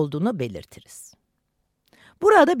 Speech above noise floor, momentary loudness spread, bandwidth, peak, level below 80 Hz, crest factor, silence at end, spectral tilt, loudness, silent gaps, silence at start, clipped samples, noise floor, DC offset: 53 dB; 27 LU; 15.5 kHz; -4 dBFS; -60 dBFS; 20 dB; 0 s; -6 dB/octave; -20 LUFS; none; 0 s; under 0.1%; -73 dBFS; under 0.1%